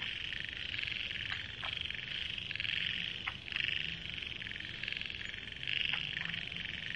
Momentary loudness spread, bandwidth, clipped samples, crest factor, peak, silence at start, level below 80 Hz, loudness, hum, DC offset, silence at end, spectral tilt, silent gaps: 6 LU; 11 kHz; under 0.1%; 22 dB; -18 dBFS; 0 s; -60 dBFS; -37 LUFS; none; under 0.1%; 0 s; -3 dB/octave; none